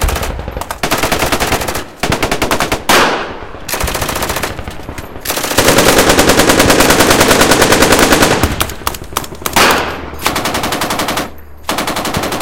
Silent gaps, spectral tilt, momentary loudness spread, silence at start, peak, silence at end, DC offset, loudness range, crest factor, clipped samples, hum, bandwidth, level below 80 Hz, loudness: none; -3 dB/octave; 14 LU; 0 s; 0 dBFS; 0 s; 3%; 7 LU; 12 dB; 0.4%; none; over 20 kHz; -26 dBFS; -11 LUFS